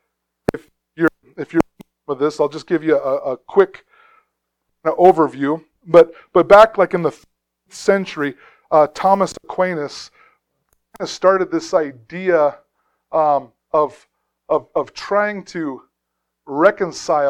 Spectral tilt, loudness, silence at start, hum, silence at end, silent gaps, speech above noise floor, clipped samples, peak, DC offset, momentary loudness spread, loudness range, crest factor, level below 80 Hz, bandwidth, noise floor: -5.5 dB/octave; -17 LUFS; 0.5 s; none; 0 s; none; 60 dB; under 0.1%; 0 dBFS; under 0.1%; 14 LU; 7 LU; 18 dB; -54 dBFS; 12 kHz; -76 dBFS